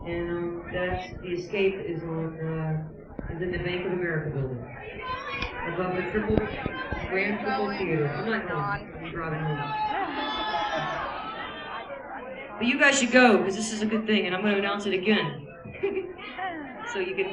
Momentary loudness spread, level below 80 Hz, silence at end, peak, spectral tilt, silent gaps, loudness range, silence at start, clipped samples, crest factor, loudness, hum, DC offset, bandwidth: 12 LU; -48 dBFS; 0 s; -6 dBFS; -5 dB/octave; none; 8 LU; 0 s; under 0.1%; 22 dB; -28 LUFS; none; under 0.1%; 11.5 kHz